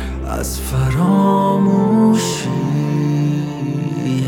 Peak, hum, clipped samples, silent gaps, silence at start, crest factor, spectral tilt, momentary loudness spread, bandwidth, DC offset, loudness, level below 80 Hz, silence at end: -2 dBFS; none; under 0.1%; none; 0 s; 14 dB; -6.5 dB/octave; 9 LU; 18 kHz; under 0.1%; -16 LUFS; -32 dBFS; 0 s